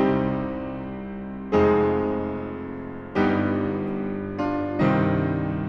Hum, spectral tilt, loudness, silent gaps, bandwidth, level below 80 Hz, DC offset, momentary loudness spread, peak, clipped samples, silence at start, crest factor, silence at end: none; -9.5 dB/octave; -25 LUFS; none; 6.6 kHz; -48 dBFS; under 0.1%; 13 LU; -8 dBFS; under 0.1%; 0 s; 16 dB; 0 s